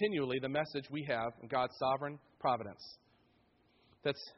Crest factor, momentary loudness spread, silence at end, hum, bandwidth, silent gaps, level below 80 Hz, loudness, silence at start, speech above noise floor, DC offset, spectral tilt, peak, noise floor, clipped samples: 18 dB; 10 LU; 0.05 s; none; 5.8 kHz; none; -74 dBFS; -37 LUFS; 0 s; 34 dB; under 0.1%; -3.5 dB/octave; -20 dBFS; -71 dBFS; under 0.1%